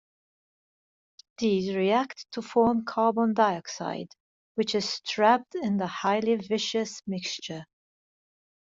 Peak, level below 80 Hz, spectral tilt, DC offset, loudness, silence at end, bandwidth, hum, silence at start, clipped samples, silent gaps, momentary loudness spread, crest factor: -8 dBFS; -68 dBFS; -4.5 dB/octave; under 0.1%; -27 LUFS; 1.15 s; 7.8 kHz; none; 1.4 s; under 0.1%; 4.20-4.55 s; 12 LU; 20 dB